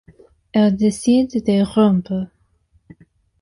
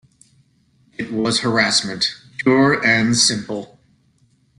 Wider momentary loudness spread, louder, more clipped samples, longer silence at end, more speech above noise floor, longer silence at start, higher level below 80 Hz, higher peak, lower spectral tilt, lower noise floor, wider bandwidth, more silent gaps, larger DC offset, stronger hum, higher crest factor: second, 11 LU vs 15 LU; about the same, -17 LUFS vs -17 LUFS; neither; first, 1.15 s vs 0.95 s; about the same, 43 dB vs 41 dB; second, 0.55 s vs 1 s; first, -50 dBFS vs -56 dBFS; about the same, -4 dBFS vs -2 dBFS; first, -7 dB/octave vs -3 dB/octave; about the same, -60 dBFS vs -59 dBFS; about the same, 11.5 kHz vs 12.5 kHz; neither; neither; neither; about the same, 14 dB vs 18 dB